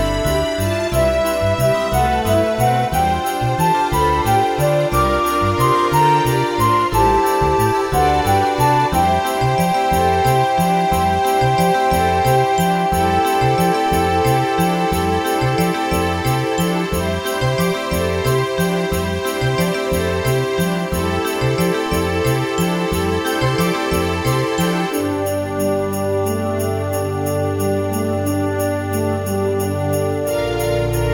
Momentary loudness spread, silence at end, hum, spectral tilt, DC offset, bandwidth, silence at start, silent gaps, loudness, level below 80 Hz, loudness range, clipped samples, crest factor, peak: 5 LU; 0 s; none; -5.5 dB/octave; under 0.1%; 19 kHz; 0 s; none; -17 LUFS; -32 dBFS; 4 LU; under 0.1%; 14 dB; -2 dBFS